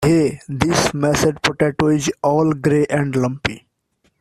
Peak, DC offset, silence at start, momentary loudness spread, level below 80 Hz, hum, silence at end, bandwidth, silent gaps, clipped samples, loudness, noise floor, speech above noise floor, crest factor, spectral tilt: -2 dBFS; under 0.1%; 0 s; 5 LU; -44 dBFS; none; 0.6 s; 14 kHz; none; under 0.1%; -18 LUFS; -65 dBFS; 47 dB; 16 dB; -5.5 dB/octave